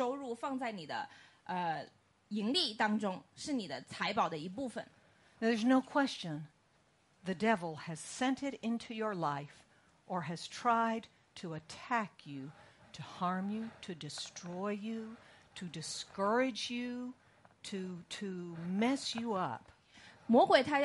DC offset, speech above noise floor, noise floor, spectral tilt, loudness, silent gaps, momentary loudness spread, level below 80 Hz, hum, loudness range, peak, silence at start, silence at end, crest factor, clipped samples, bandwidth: under 0.1%; 35 dB; -71 dBFS; -4.5 dB/octave; -36 LUFS; none; 17 LU; -78 dBFS; none; 5 LU; -12 dBFS; 0 s; 0 s; 24 dB; under 0.1%; 11.5 kHz